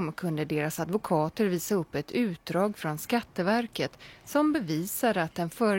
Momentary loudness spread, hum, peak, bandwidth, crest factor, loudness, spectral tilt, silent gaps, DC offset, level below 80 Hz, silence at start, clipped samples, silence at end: 5 LU; none; -12 dBFS; 17 kHz; 16 dB; -29 LUFS; -5.5 dB/octave; none; under 0.1%; -62 dBFS; 0 s; under 0.1%; 0 s